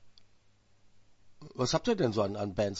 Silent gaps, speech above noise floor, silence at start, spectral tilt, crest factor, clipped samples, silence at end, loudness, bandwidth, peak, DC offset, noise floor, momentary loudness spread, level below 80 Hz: none; 33 dB; 0 s; -5.5 dB/octave; 20 dB; under 0.1%; 0 s; -31 LUFS; 8 kHz; -14 dBFS; under 0.1%; -64 dBFS; 6 LU; -58 dBFS